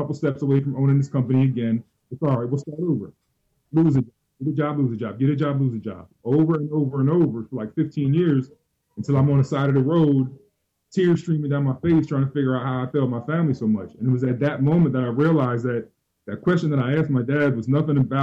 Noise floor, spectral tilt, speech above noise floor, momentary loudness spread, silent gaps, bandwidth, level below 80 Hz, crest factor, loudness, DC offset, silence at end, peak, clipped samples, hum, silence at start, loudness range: -57 dBFS; -9.5 dB/octave; 36 dB; 9 LU; none; 7.6 kHz; -58 dBFS; 10 dB; -22 LUFS; under 0.1%; 0 s; -10 dBFS; under 0.1%; none; 0 s; 2 LU